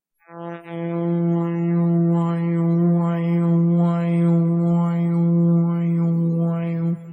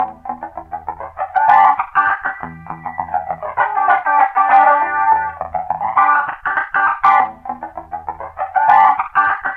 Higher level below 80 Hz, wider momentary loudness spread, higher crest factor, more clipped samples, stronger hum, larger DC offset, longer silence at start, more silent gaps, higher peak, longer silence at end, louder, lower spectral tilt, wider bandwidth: second, -66 dBFS vs -52 dBFS; second, 7 LU vs 18 LU; about the same, 10 dB vs 14 dB; neither; neither; neither; first, 0.3 s vs 0 s; neither; second, -8 dBFS vs -2 dBFS; about the same, 0 s vs 0 s; second, -20 LUFS vs -14 LUFS; first, -11.5 dB/octave vs -5.5 dB/octave; second, 3.4 kHz vs 5.2 kHz